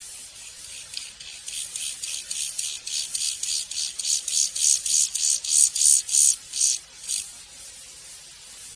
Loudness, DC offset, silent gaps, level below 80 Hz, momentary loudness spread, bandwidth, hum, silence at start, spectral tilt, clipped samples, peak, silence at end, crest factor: -21 LUFS; under 0.1%; none; -64 dBFS; 23 LU; 11 kHz; none; 0 s; 4 dB/octave; under 0.1%; -2 dBFS; 0 s; 24 dB